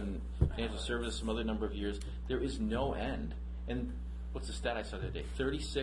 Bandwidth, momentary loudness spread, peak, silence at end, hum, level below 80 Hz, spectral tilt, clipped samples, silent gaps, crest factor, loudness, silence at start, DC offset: 11.5 kHz; 8 LU; -16 dBFS; 0 s; none; -40 dBFS; -6 dB/octave; under 0.1%; none; 20 dB; -38 LUFS; 0 s; under 0.1%